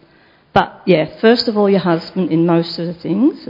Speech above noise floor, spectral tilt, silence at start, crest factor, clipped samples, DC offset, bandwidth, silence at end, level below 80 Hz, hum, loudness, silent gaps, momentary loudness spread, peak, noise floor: 36 dB; -8 dB/octave; 0.55 s; 16 dB; under 0.1%; under 0.1%; 6 kHz; 0.05 s; -52 dBFS; none; -15 LUFS; none; 6 LU; 0 dBFS; -50 dBFS